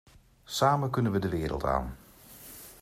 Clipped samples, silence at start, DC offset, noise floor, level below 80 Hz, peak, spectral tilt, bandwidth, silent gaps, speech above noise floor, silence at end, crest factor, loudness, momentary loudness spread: under 0.1%; 0.5 s; under 0.1%; -51 dBFS; -46 dBFS; -12 dBFS; -6 dB/octave; 16 kHz; none; 23 dB; 0.05 s; 20 dB; -29 LUFS; 20 LU